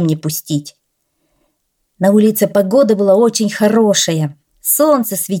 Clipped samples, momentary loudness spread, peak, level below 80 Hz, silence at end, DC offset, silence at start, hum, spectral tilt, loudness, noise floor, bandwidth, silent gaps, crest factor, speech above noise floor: under 0.1%; 9 LU; 0 dBFS; -62 dBFS; 0 s; under 0.1%; 0 s; none; -5 dB/octave; -13 LUFS; -67 dBFS; 18.5 kHz; none; 14 dB; 54 dB